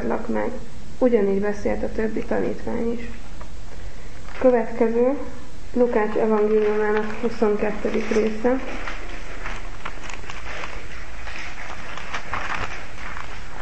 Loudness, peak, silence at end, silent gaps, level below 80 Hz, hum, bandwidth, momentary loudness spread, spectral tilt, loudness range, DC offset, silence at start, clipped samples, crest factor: -24 LUFS; -6 dBFS; 0 s; none; -38 dBFS; none; 8.8 kHz; 18 LU; -6 dB/octave; 10 LU; 7%; 0 s; under 0.1%; 18 dB